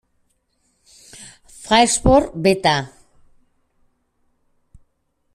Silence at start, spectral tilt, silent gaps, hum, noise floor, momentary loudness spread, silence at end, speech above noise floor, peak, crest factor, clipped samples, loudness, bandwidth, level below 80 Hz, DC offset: 1.2 s; -4 dB/octave; none; none; -68 dBFS; 25 LU; 2.5 s; 52 dB; -2 dBFS; 20 dB; under 0.1%; -16 LUFS; 15 kHz; -38 dBFS; under 0.1%